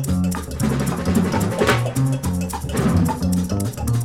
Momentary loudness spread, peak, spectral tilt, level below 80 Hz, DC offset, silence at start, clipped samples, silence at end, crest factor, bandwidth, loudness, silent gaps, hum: 5 LU; -4 dBFS; -6 dB/octave; -34 dBFS; under 0.1%; 0 s; under 0.1%; 0 s; 16 dB; 17 kHz; -21 LUFS; none; none